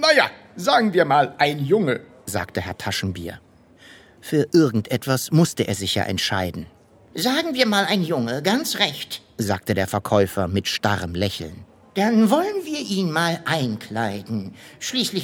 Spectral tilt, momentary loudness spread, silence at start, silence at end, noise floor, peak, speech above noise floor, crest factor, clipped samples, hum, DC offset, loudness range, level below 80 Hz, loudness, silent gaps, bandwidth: -4.5 dB/octave; 12 LU; 0 s; 0 s; -49 dBFS; -2 dBFS; 27 dB; 20 dB; under 0.1%; none; under 0.1%; 2 LU; -54 dBFS; -21 LUFS; none; 18.5 kHz